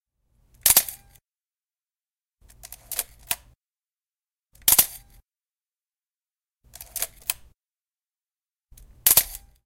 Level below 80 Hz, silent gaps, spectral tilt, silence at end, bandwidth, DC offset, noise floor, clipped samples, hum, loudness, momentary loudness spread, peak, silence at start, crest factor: -54 dBFS; none; 1 dB/octave; 0.3 s; 17 kHz; under 0.1%; under -90 dBFS; under 0.1%; none; -21 LUFS; 16 LU; 0 dBFS; 0.65 s; 28 dB